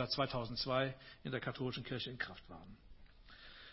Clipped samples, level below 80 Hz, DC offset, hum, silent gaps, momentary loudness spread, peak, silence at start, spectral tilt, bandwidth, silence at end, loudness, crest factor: under 0.1%; -62 dBFS; under 0.1%; none; none; 20 LU; -20 dBFS; 0 s; -8 dB/octave; 5.8 kHz; 0 s; -41 LUFS; 22 dB